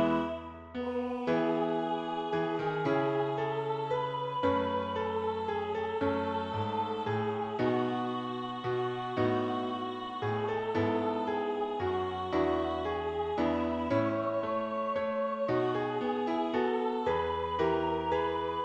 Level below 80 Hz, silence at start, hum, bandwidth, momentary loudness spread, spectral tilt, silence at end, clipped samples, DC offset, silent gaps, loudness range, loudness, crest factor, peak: -58 dBFS; 0 s; none; 8.2 kHz; 4 LU; -7.5 dB/octave; 0 s; under 0.1%; under 0.1%; none; 1 LU; -32 LUFS; 16 dB; -16 dBFS